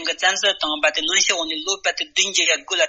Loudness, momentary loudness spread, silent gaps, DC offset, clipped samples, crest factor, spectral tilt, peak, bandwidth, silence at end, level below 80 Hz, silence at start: -18 LUFS; 5 LU; none; under 0.1%; under 0.1%; 20 dB; 1.5 dB/octave; -2 dBFS; 8.4 kHz; 0 s; -62 dBFS; 0 s